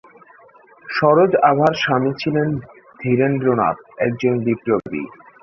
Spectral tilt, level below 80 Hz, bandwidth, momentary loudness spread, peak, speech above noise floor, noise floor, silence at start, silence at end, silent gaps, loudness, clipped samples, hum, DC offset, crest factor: -7.5 dB/octave; -56 dBFS; 6.8 kHz; 13 LU; -2 dBFS; 31 dB; -48 dBFS; 0.85 s; 0.35 s; none; -18 LUFS; under 0.1%; none; under 0.1%; 18 dB